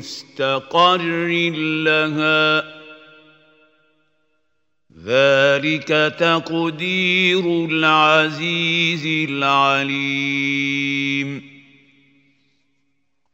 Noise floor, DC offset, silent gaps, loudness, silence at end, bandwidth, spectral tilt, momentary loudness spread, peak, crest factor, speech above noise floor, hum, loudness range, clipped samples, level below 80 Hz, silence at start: -74 dBFS; under 0.1%; none; -17 LUFS; 1.85 s; 16 kHz; -5 dB/octave; 7 LU; -2 dBFS; 18 dB; 56 dB; none; 6 LU; under 0.1%; -68 dBFS; 0 s